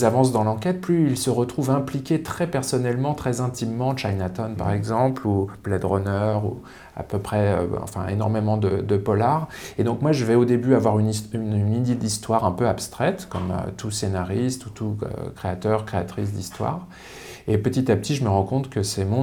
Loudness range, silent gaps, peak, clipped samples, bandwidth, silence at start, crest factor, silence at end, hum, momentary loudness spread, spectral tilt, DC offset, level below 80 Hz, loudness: 5 LU; none; -4 dBFS; under 0.1%; 19.5 kHz; 0 s; 18 dB; 0 s; none; 9 LU; -6.5 dB/octave; under 0.1%; -50 dBFS; -23 LUFS